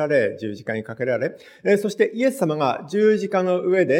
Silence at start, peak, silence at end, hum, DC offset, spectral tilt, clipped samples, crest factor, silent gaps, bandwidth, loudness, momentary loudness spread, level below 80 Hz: 0 s; -4 dBFS; 0 s; none; under 0.1%; -6.5 dB/octave; under 0.1%; 16 dB; none; 16.5 kHz; -22 LUFS; 9 LU; -74 dBFS